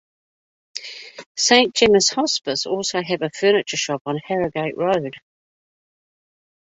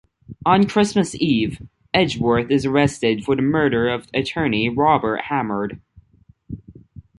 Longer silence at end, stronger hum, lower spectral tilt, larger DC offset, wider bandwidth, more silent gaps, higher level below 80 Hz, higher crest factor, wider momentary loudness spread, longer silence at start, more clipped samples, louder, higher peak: first, 1.6 s vs 0.5 s; neither; second, -2.5 dB/octave vs -6 dB/octave; neither; second, 8.4 kHz vs 11.5 kHz; first, 1.26-1.35 s, 4.01-4.05 s vs none; second, -58 dBFS vs -48 dBFS; about the same, 20 dB vs 18 dB; first, 18 LU vs 10 LU; first, 0.75 s vs 0.3 s; neither; about the same, -19 LUFS vs -19 LUFS; about the same, -2 dBFS vs -2 dBFS